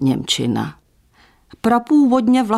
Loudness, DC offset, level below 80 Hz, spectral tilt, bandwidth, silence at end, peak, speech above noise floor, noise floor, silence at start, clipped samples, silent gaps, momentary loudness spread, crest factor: -17 LUFS; under 0.1%; -52 dBFS; -5 dB/octave; 13.5 kHz; 0 s; -4 dBFS; 38 dB; -54 dBFS; 0 s; under 0.1%; none; 10 LU; 14 dB